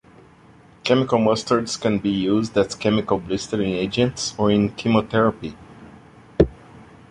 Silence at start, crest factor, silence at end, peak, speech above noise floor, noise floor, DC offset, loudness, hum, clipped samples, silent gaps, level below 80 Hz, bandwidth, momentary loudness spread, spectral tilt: 0.85 s; 20 dB; 0.3 s; -2 dBFS; 29 dB; -49 dBFS; under 0.1%; -21 LUFS; none; under 0.1%; none; -42 dBFS; 11.5 kHz; 5 LU; -5.5 dB/octave